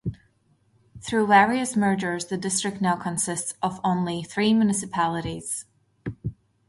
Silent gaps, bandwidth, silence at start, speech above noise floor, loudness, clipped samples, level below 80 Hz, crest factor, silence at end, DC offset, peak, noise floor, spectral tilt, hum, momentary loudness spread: none; 11.5 kHz; 0.05 s; 41 dB; -24 LUFS; under 0.1%; -54 dBFS; 20 dB; 0.35 s; under 0.1%; -6 dBFS; -64 dBFS; -4.5 dB/octave; none; 16 LU